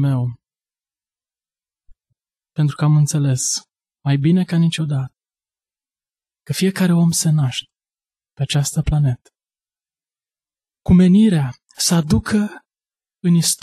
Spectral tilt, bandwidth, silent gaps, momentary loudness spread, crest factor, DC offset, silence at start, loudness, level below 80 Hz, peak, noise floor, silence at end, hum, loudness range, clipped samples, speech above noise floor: -5.5 dB/octave; 13 kHz; none; 13 LU; 16 dB; under 0.1%; 0 s; -18 LUFS; -40 dBFS; -4 dBFS; under -90 dBFS; 0.05 s; none; 5 LU; under 0.1%; over 74 dB